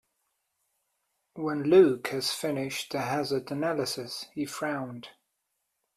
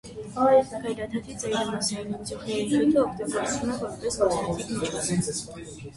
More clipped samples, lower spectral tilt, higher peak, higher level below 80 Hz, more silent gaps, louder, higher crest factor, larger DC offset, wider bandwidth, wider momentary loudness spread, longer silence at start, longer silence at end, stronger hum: neither; about the same, -4.5 dB/octave vs -4.5 dB/octave; about the same, -8 dBFS vs -8 dBFS; second, -70 dBFS vs -52 dBFS; neither; about the same, -28 LUFS vs -26 LUFS; about the same, 22 dB vs 18 dB; neither; first, 14.5 kHz vs 11.5 kHz; first, 15 LU vs 12 LU; first, 1.35 s vs 0.05 s; first, 0.85 s vs 0 s; neither